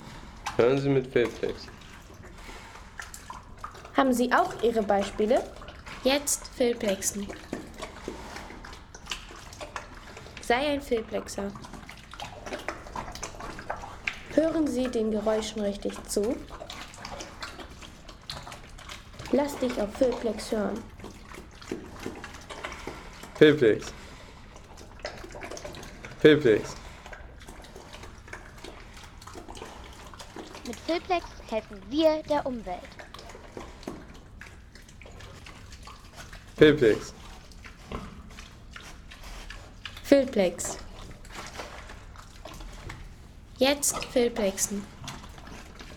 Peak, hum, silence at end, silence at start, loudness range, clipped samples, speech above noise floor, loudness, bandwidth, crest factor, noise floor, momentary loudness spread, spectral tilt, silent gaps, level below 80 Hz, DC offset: -6 dBFS; none; 0 s; 0 s; 10 LU; under 0.1%; 23 dB; -27 LUFS; 18.5 kHz; 24 dB; -48 dBFS; 22 LU; -4 dB/octave; none; -48 dBFS; under 0.1%